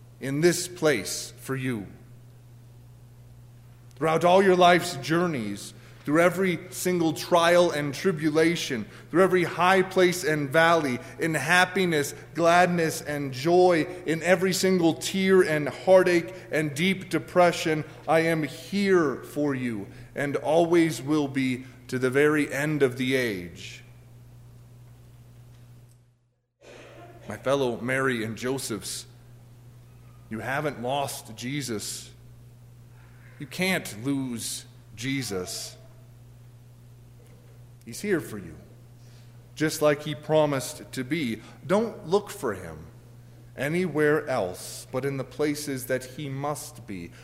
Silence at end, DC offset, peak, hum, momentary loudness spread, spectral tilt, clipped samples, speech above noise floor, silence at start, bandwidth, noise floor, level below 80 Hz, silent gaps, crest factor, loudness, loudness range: 0 s; under 0.1%; -6 dBFS; 60 Hz at -50 dBFS; 15 LU; -5 dB/octave; under 0.1%; 44 dB; 0 s; 16 kHz; -69 dBFS; -60 dBFS; none; 20 dB; -25 LUFS; 11 LU